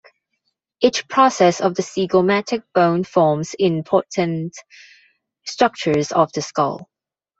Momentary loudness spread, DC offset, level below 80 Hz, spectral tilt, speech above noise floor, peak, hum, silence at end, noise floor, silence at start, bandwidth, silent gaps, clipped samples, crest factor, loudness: 7 LU; under 0.1%; -62 dBFS; -5 dB/octave; 55 dB; -2 dBFS; none; 0.55 s; -73 dBFS; 0.8 s; 8 kHz; none; under 0.1%; 18 dB; -18 LUFS